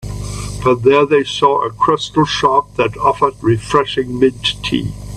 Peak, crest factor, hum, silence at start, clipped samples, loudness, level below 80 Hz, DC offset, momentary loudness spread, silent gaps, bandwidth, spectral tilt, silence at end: 0 dBFS; 14 dB; 50 Hz at -35 dBFS; 0 s; under 0.1%; -15 LUFS; -36 dBFS; under 0.1%; 7 LU; none; 13 kHz; -5.5 dB/octave; 0 s